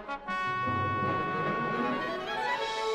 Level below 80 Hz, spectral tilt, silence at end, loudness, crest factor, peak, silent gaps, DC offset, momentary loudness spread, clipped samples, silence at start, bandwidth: -58 dBFS; -5.5 dB/octave; 0 s; -31 LUFS; 14 dB; -18 dBFS; none; under 0.1%; 3 LU; under 0.1%; 0 s; 13 kHz